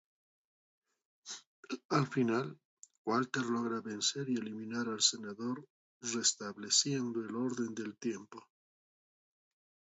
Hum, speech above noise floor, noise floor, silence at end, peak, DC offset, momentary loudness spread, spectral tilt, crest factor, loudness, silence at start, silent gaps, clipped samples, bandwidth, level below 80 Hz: none; over 54 dB; under -90 dBFS; 1.5 s; -14 dBFS; under 0.1%; 16 LU; -3.5 dB/octave; 22 dB; -35 LUFS; 1.25 s; 1.46-1.63 s, 1.85-1.89 s, 2.65-2.83 s, 2.98-3.05 s, 5.70-6.01 s; under 0.1%; 8 kHz; -84 dBFS